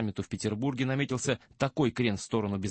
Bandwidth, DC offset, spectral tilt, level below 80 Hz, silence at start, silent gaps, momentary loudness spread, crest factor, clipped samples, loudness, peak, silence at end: 8.8 kHz; under 0.1%; -5.5 dB/octave; -58 dBFS; 0 s; none; 5 LU; 18 dB; under 0.1%; -31 LUFS; -14 dBFS; 0 s